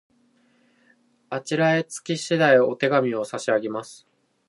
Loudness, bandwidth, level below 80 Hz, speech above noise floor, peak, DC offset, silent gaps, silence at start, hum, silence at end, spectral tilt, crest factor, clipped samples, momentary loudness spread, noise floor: -22 LUFS; 11.5 kHz; -76 dBFS; 40 dB; -4 dBFS; under 0.1%; none; 1.3 s; none; 0.55 s; -5 dB/octave; 20 dB; under 0.1%; 15 LU; -62 dBFS